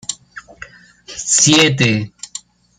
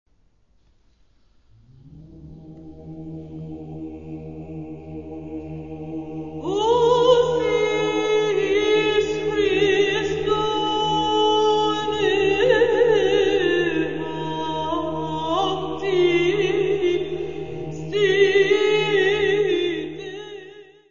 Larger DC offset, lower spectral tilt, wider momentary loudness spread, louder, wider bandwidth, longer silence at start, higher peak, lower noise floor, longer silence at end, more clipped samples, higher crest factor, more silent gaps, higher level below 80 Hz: second, under 0.1% vs 0.6%; second, -2.5 dB/octave vs -5 dB/octave; first, 22 LU vs 18 LU; first, -12 LUFS vs -20 LUFS; first, 13.5 kHz vs 7.4 kHz; about the same, 0.1 s vs 0.15 s; first, 0 dBFS vs -4 dBFS; second, -40 dBFS vs -61 dBFS; first, 0.4 s vs 0 s; neither; about the same, 18 dB vs 18 dB; neither; about the same, -52 dBFS vs -50 dBFS